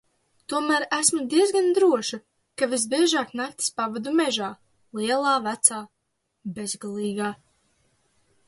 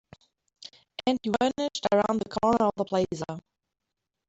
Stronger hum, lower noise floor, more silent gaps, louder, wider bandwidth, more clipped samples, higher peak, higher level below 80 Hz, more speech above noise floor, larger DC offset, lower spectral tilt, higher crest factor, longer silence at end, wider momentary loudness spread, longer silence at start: neither; second, -77 dBFS vs -85 dBFS; neither; first, -23 LUFS vs -27 LUFS; first, 12 kHz vs 8.2 kHz; neither; first, -2 dBFS vs -12 dBFS; second, -72 dBFS vs -60 dBFS; second, 53 dB vs 58 dB; neither; second, -2.5 dB/octave vs -5.5 dB/octave; about the same, 22 dB vs 18 dB; first, 1.15 s vs 0.9 s; second, 15 LU vs 18 LU; about the same, 0.5 s vs 0.6 s